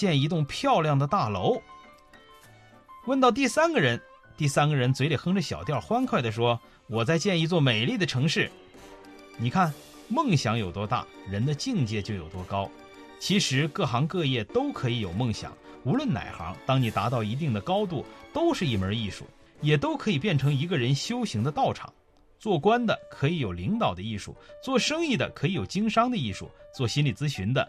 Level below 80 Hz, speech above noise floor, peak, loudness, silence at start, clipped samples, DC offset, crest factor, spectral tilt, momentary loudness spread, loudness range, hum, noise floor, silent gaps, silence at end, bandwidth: -58 dBFS; 27 dB; -8 dBFS; -27 LUFS; 0 s; under 0.1%; under 0.1%; 18 dB; -5.5 dB/octave; 11 LU; 3 LU; none; -53 dBFS; none; 0 s; 13.5 kHz